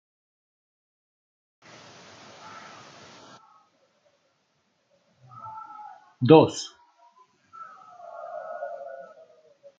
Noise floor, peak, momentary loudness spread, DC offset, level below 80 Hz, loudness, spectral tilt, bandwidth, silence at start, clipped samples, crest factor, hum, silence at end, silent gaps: -71 dBFS; -2 dBFS; 31 LU; under 0.1%; -72 dBFS; -22 LUFS; -6.5 dB/octave; 9 kHz; 5.45 s; under 0.1%; 28 dB; none; 0.75 s; none